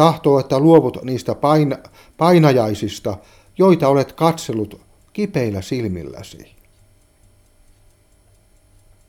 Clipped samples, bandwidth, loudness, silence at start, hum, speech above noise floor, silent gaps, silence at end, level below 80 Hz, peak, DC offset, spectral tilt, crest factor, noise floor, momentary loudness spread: under 0.1%; 16.5 kHz; -17 LUFS; 0 s; none; 37 dB; none; 2.7 s; -52 dBFS; 0 dBFS; under 0.1%; -7 dB/octave; 18 dB; -54 dBFS; 18 LU